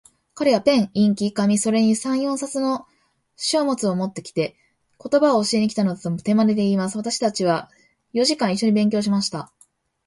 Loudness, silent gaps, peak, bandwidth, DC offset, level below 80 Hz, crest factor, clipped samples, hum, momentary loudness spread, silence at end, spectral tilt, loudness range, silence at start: -21 LUFS; none; -4 dBFS; 11.5 kHz; under 0.1%; -64 dBFS; 16 dB; under 0.1%; none; 8 LU; 0.6 s; -5 dB/octave; 2 LU; 0.35 s